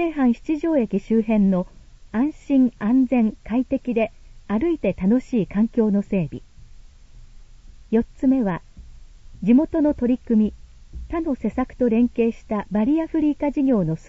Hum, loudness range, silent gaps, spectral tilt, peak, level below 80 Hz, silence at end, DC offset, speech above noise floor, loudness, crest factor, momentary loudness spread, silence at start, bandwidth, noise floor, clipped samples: none; 3 LU; none; -9 dB/octave; -6 dBFS; -42 dBFS; 0.1 s; under 0.1%; 24 dB; -21 LUFS; 16 dB; 8 LU; 0 s; 7.6 kHz; -44 dBFS; under 0.1%